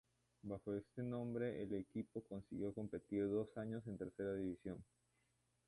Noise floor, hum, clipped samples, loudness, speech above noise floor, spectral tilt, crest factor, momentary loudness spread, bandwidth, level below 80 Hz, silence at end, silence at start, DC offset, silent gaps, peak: -83 dBFS; 60 Hz at -70 dBFS; under 0.1%; -47 LUFS; 37 dB; -9 dB/octave; 16 dB; 9 LU; 11.5 kHz; -72 dBFS; 0.85 s; 0.45 s; under 0.1%; none; -30 dBFS